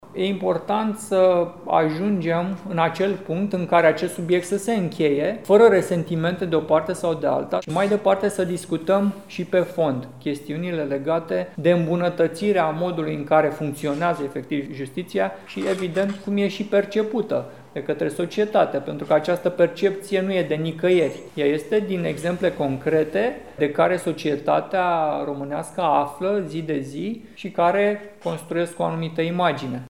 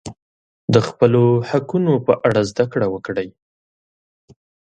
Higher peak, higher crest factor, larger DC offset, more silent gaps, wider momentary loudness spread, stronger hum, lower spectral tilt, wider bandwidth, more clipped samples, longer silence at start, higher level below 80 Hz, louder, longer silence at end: second, -4 dBFS vs 0 dBFS; about the same, 18 dB vs 18 dB; first, 0.2% vs under 0.1%; second, none vs 0.22-0.68 s; second, 8 LU vs 12 LU; neither; about the same, -6.5 dB/octave vs -7.5 dB/octave; first, 16.5 kHz vs 9.2 kHz; neither; about the same, 0.05 s vs 0.05 s; second, -62 dBFS vs -52 dBFS; second, -22 LUFS vs -18 LUFS; second, 0 s vs 1.4 s